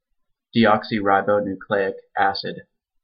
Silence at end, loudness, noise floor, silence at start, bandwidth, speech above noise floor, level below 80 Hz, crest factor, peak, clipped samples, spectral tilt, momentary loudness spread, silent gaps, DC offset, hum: 0.4 s; -21 LUFS; -71 dBFS; 0.55 s; 5.4 kHz; 51 dB; -60 dBFS; 18 dB; -4 dBFS; under 0.1%; -10 dB/octave; 10 LU; none; under 0.1%; none